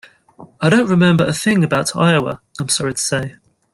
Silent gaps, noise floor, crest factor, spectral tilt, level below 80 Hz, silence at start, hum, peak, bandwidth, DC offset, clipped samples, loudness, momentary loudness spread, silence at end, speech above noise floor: none; -43 dBFS; 16 dB; -5 dB/octave; -50 dBFS; 0.4 s; none; -2 dBFS; 12.5 kHz; under 0.1%; under 0.1%; -16 LUFS; 10 LU; 0.4 s; 28 dB